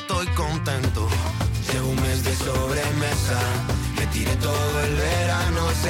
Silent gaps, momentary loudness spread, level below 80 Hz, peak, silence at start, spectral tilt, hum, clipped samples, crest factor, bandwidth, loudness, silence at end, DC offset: none; 3 LU; -30 dBFS; -12 dBFS; 0 s; -4.5 dB/octave; none; under 0.1%; 12 dB; 17 kHz; -23 LUFS; 0 s; under 0.1%